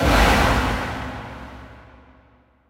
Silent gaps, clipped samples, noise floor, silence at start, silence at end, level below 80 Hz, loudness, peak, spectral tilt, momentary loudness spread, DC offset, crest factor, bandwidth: none; under 0.1%; -56 dBFS; 0 s; 0.9 s; -28 dBFS; -20 LUFS; -4 dBFS; -5 dB/octave; 23 LU; under 0.1%; 18 dB; 16 kHz